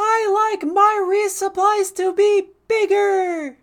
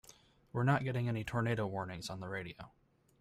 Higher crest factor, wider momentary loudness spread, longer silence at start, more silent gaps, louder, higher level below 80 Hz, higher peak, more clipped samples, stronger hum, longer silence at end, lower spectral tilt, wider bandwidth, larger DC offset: second, 14 dB vs 20 dB; second, 5 LU vs 14 LU; second, 0 s vs 0.55 s; neither; first, -18 LUFS vs -37 LUFS; about the same, -66 dBFS vs -64 dBFS; first, -4 dBFS vs -18 dBFS; neither; neither; second, 0.1 s vs 0.55 s; second, -1.5 dB/octave vs -6.5 dB/octave; first, 17.5 kHz vs 14.5 kHz; neither